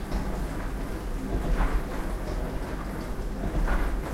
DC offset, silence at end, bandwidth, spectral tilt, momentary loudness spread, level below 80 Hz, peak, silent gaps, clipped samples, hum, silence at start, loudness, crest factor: under 0.1%; 0 s; 15.5 kHz; -6.5 dB/octave; 6 LU; -30 dBFS; -14 dBFS; none; under 0.1%; none; 0 s; -32 LUFS; 14 dB